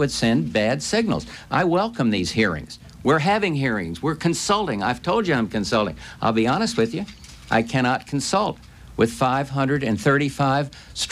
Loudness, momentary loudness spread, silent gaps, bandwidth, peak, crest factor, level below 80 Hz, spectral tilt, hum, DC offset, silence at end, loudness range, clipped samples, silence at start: -22 LUFS; 8 LU; none; 14.5 kHz; -6 dBFS; 16 dB; -48 dBFS; -5 dB/octave; none; under 0.1%; 0 s; 1 LU; under 0.1%; 0 s